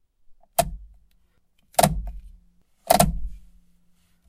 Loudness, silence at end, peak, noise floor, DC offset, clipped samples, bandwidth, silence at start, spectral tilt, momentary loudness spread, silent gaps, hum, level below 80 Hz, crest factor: -23 LUFS; 0.9 s; 0 dBFS; -63 dBFS; under 0.1%; under 0.1%; 16 kHz; 0.3 s; -4 dB/octave; 22 LU; none; none; -38 dBFS; 26 dB